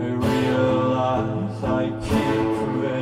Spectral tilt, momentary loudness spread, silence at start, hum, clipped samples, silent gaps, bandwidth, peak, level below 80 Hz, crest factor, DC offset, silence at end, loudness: -7 dB/octave; 4 LU; 0 s; none; under 0.1%; none; 15.5 kHz; -8 dBFS; -42 dBFS; 14 dB; under 0.1%; 0 s; -22 LUFS